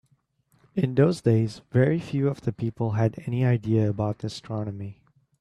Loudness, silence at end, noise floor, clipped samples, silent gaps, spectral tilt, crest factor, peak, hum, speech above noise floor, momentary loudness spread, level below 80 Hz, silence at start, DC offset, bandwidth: -25 LUFS; 0.45 s; -67 dBFS; under 0.1%; none; -8.5 dB/octave; 18 dB; -8 dBFS; none; 43 dB; 11 LU; -58 dBFS; 0.75 s; under 0.1%; 10.5 kHz